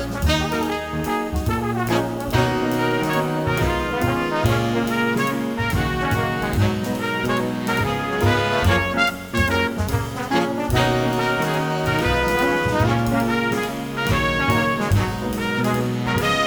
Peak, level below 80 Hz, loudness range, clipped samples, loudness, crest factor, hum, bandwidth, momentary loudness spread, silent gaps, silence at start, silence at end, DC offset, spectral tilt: -4 dBFS; -34 dBFS; 2 LU; under 0.1%; -21 LUFS; 18 dB; none; over 20 kHz; 5 LU; none; 0 s; 0 s; under 0.1%; -5.5 dB/octave